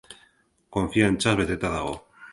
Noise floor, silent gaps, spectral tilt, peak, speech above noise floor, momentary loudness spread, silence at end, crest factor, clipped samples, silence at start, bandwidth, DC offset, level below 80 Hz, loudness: -63 dBFS; none; -5 dB/octave; -6 dBFS; 39 dB; 12 LU; 0 s; 20 dB; under 0.1%; 0.1 s; 11.5 kHz; under 0.1%; -44 dBFS; -25 LUFS